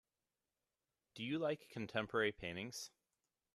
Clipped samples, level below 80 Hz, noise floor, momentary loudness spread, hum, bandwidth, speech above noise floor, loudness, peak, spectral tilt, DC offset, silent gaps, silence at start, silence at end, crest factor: under 0.1%; -74 dBFS; under -90 dBFS; 12 LU; none; 13.5 kHz; over 48 dB; -42 LUFS; -22 dBFS; -4.5 dB/octave; under 0.1%; none; 1.15 s; 0.65 s; 22 dB